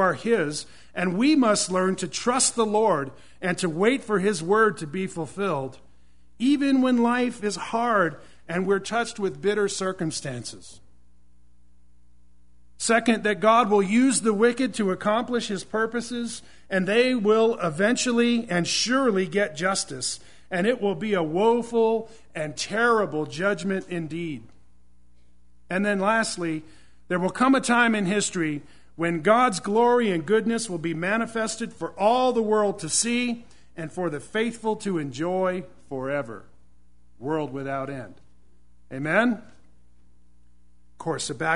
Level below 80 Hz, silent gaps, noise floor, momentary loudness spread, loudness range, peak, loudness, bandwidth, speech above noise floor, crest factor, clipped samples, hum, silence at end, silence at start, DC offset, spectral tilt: -60 dBFS; none; -61 dBFS; 12 LU; 8 LU; -4 dBFS; -24 LUFS; 11 kHz; 37 dB; 20 dB; under 0.1%; none; 0 s; 0 s; 0.5%; -4 dB/octave